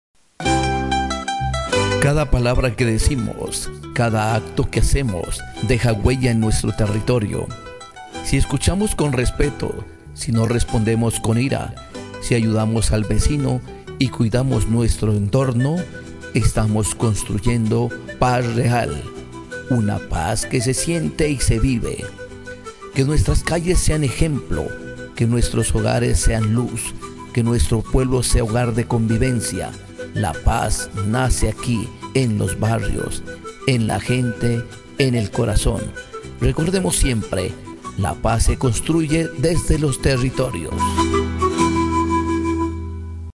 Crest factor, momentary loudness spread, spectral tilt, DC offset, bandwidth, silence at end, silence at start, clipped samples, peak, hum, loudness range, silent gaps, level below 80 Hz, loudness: 18 dB; 11 LU; -5.5 dB/octave; under 0.1%; 12 kHz; 0.05 s; 0.4 s; under 0.1%; -2 dBFS; none; 2 LU; none; -28 dBFS; -20 LUFS